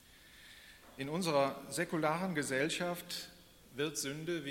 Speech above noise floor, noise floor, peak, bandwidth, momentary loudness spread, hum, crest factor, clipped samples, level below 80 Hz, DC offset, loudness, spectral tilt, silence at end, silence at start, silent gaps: 23 dB; -59 dBFS; -18 dBFS; 16.5 kHz; 21 LU; none; 20 dB; under 0.1%; -70 dBFS; under 0.1%; -36 LUFS; -4 dB/octave; 0 s; 0.1 s; none